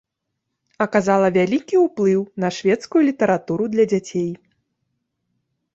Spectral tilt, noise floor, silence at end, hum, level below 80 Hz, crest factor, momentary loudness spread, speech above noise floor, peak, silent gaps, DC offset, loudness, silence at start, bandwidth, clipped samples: -6.5 dB/octave; -78 dBFS; 1.4 s; none; -62 dBFS; 18 dB; 8 LU; 60 dB; -4 dBFS; none; under 0.1%; -19 LUFS; 0.8 s; 7.8 kHz; under 0.1%